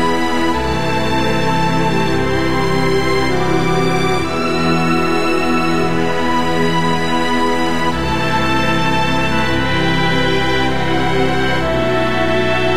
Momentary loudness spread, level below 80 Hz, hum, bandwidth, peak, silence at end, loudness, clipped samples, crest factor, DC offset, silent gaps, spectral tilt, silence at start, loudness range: 2 LU; -32 dBFS; none; 16 kHz; -2 dBFS; 0 s; -16 LUFS; under 0.1%; 14 dB; 10%; none; -5.5 dB/octave; 0 s; 1 LU